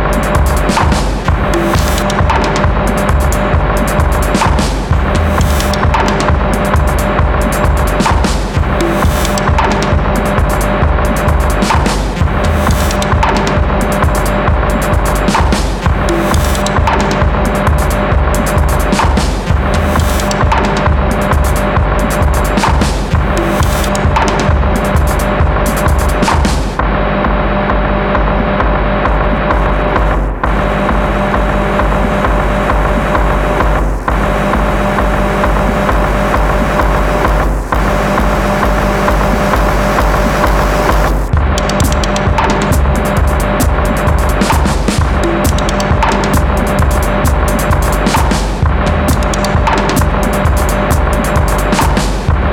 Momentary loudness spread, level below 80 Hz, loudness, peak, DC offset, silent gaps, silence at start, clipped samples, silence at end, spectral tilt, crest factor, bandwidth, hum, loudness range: 2 LU; -14 dBFS; -12 LUFS; 0 dBFS; under 0.1%; none; 0 s; under 0.1%; 0 s; -5.5 dB/octave; 10 dB; 17.5 kHz; none; 1 LU